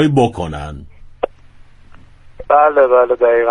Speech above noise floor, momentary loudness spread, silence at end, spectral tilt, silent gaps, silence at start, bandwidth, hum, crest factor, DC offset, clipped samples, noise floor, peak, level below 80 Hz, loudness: 28 dB; 17 LU; 0 s; -7.5 dB/octave; none; 0 s; 10 kHz; none; 14 dB; under 0.1%; under 0.1%; -40 dBFS; 0 dBFS; -40 dBFS; -14 LUFS